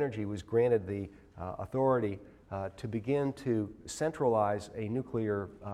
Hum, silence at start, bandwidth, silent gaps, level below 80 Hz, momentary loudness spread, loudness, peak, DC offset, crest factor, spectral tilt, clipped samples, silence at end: none; 0 s; 13 kHz; none; -60 dBFS; 12 LU; -33 LUFS; -16 dBFS; under 0.1%; 16 dB; -7 dB/octave; under 0.1%; 0 s